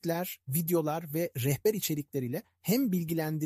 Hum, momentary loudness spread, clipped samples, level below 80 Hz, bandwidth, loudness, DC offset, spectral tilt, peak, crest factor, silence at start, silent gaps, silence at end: none; 6 LU; under 0.1%; -68 dBFS; 15.5 kHz; -31 LUFS; under 0.1%; -5.5 dB/octave; -16 dBFS; 16 dB; 0.05 s; none; 0 s